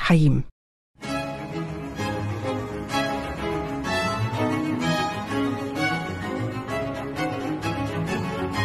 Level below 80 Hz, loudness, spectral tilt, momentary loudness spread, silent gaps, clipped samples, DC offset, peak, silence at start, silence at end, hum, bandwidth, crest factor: -44 dBFS; -26 LUFS; -6 dB/octave; 6 LU; 0.52-0.94 s; under 0.1%; under 0.1%; -6 dBFS; 0 s; 0 s; none; 13 kHz; 20 dB